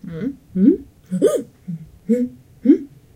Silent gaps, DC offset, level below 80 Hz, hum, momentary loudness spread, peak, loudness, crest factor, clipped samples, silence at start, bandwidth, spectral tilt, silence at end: none; under 0.1%; -52 dBFS; none; 16 LU; -2 dBFS; -20 LUFS; 18 dB; under 0.1%; 0.05 s; 15.5 kHz; -8 dB/octave; 0.3 s